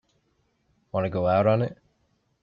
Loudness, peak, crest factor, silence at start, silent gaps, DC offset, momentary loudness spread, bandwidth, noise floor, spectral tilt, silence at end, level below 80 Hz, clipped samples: -25 LUFS; -10 dBFS; 18 dB; 0.95 s; none; under 0.1%; 11 LU; 5.6 kHz; -70 dBFS; -10 dB/octave; 0.7 s; -60 dBFS; under 0.1%